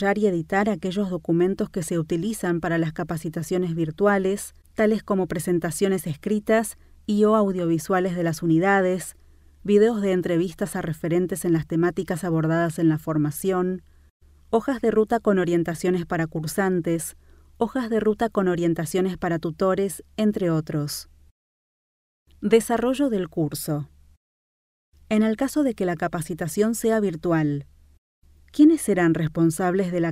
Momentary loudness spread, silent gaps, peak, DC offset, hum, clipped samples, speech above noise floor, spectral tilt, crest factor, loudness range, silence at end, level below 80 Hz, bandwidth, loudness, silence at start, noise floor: 8 LU; 14.10-14.20 s, 21.31-22.26 s, 24.17-24.92 s, 27.98-28.22 s; -6 dBFS; under 0.1%; none; under 0.1%; over 68 dB; -6.5 dB/octave; 18 dB; 4 LU; 0 s; -52 dBFS; 16 kHz; -23 LUFS; 0 s; under -90 dBFS